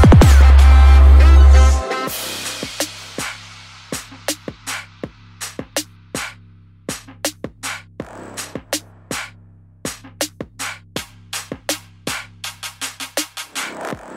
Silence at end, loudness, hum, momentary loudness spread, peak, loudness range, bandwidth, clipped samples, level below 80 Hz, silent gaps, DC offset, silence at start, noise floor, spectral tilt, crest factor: 0 s; -17 LUFS; none; 21 LU; -2 dBFS; 15 LU; 16 kHz; under 0.1%; -16 dBFS; none; under 0.1%; 0 s; -46 dBFS; -5 dB/octave; 14 dB